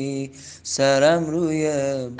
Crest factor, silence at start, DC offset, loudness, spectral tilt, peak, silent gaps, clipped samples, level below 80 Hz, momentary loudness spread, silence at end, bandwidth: 16 dB; 0 s; under 0.1%; -21 LUFS; -4.5 dB/octave; -4 dBFS; none; under 0.1%; -62 dBFS; 15 LU; 0 s; 10 kHz